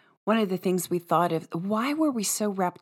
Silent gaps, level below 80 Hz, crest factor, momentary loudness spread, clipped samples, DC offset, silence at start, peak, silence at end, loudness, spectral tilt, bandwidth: none; -84 dBFS; 18 dB; 3 LU; under 0.1%; under 0.1%; 0.25 s; -8 dBFS; 0.1 s; -26 LUFS; -4.5 dB/octave; 17 kHz